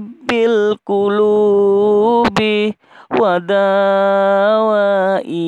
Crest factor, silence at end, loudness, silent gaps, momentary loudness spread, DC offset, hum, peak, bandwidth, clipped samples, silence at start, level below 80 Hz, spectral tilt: 10 dB; 0 s; -14 LUFS; none; 5 LU; under 0.1%; none; -2 dBFS; 9.4 kHz; under 0.1%; 0 s; -54 dBFS; -6.5 dB/octave